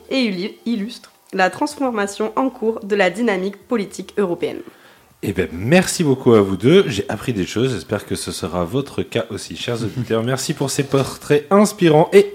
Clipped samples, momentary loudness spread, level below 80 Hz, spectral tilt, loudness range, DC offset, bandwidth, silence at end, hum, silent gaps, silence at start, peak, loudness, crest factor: under 0.1%; 11 LU; -52 dBFS; -5.5 dB/octave; 5 LU; under 0.1%; 16.5 kHz; 0 s; none; none; 0.1 s; 0 dBFS; -19 LUFS; 18 dB